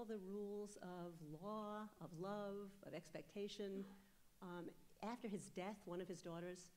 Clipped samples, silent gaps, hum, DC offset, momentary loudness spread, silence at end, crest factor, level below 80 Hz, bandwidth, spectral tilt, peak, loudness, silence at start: under 0.1%; none; none; under 0.1%; 6 LU; 0 s; 16 dB; -78 dBFS; 16 kHz; -5.5 dB/octave; -36 dBFS; -52 LUFS; 0 s